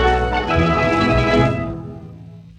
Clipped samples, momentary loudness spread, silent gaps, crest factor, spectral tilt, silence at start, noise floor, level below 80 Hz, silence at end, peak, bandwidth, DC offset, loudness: under 0.1%; 19 LU; none; 14 dB; -7 dB/octave; 0 s; -38 dBFS; -28 dBFS; 0.15 s; -4 dBFS; 9.6 kHz; under 0.1%; -17 LUFS